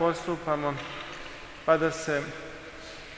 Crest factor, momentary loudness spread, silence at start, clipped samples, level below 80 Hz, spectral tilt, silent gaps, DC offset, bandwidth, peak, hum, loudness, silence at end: 22 dB; 17 LU; 0 s; under 0.1%; -56 dBFS; -5 dB/octave; none; under 0.1%; 8 kHz; -8 dBFS; none; -29 LUFS; 0 s